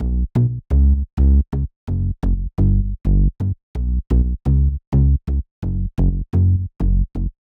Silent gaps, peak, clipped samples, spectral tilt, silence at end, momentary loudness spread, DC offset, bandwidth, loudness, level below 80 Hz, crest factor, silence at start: 1.13-1.17 s, 1.76-1.87 s, 3.63-3.74 s, 4.87-4.92 s, 5.51-5.62 s; -4 dBFS; under 0.1%; -11.5 dB/octave; 0.15 s; 8 LU; under 0.1%; 2.2 kHz; -20 LUFS; -18 dBFS; 12 dB; 0 s